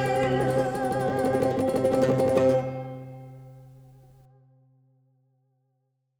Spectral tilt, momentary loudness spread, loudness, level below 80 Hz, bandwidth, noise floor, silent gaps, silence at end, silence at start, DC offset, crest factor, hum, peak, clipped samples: -7 dB/octave; 19 LU; -25 LUFS; -56 dBFS; 17 kHz; -75 dBFS; none; 2.5 s; 0 s; under 0.1%; 18 dB; none; -10 dBFS; under 0.1%